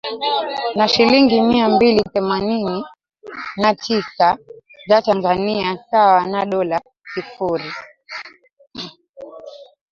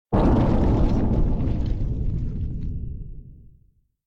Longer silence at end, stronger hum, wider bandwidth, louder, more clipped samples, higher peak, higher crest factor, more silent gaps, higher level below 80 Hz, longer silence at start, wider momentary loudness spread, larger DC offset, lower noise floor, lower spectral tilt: second, 0.25 s vs 0.7 s; neither; first, 7.4 kHz vs 6.4 kHz; first, -17 LUFS vs -24 LUFS; neither; first, -2 dBFS vs -10 dBFS; about the same, 16 dB vs 12 dB; first, 9.09-9.14 s vs none; second, -54 dBFS vs -26 dBFS; about the same, 0.05 s vs 0.1 s; first, 20 LU vs 14 LU; neither; second, -39 dBFS vs -60 dBFS; second, -5.5 dB/octave vs -10 dB/octave